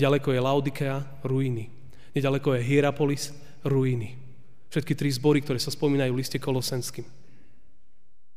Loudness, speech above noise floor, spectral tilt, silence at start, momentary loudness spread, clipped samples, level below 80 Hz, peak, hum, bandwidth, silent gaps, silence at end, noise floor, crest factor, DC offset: -27 LUFS; 46 dB; -6 dB/octave; 0 s; 11 LU; under 0.1%; -62 dBFS; -10 dBFS; none; 15.5 kHz; none; 1.35 s; -72 dBFS; 18 dB; 1%